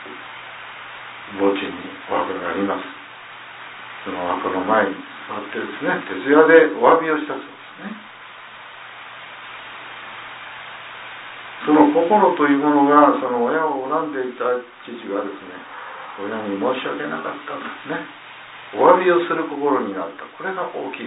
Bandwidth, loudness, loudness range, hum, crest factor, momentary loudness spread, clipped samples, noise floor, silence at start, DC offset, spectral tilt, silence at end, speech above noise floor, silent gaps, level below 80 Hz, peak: 4 kHz; -19 LUFS; 11 LU; none; 20 dB; 21 LU; under 0.1%; -39 dBFS; 0 s; under 0.1%; -9.5 dB/octave; 0 s; 20 dB; none; -68 dBFS; 0 dBFS